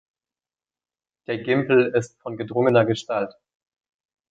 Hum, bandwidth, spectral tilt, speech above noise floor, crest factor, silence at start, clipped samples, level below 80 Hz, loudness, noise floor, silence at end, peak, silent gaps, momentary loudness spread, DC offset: none; 8 kHz; -6.5 dB/octave; over 69 dB; 20 dB; 1.3 s; under 0.1%; -64 dBFS; -21 LUFS; under -90 dBFS; 1 s; -4 dBFS; none; 14 LU; under 0.1%